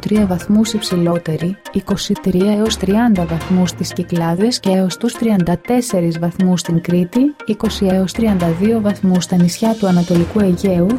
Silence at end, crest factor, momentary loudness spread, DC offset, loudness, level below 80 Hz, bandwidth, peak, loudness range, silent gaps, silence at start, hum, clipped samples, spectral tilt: 0 s; 12 dB; 5 LU; under 0.1%; -16 LUFS; -38 dBFS; 15.5 kHz; -4 dBFS; 1 LU; none; 0 s; none; under 0.1%; -6 dB/octave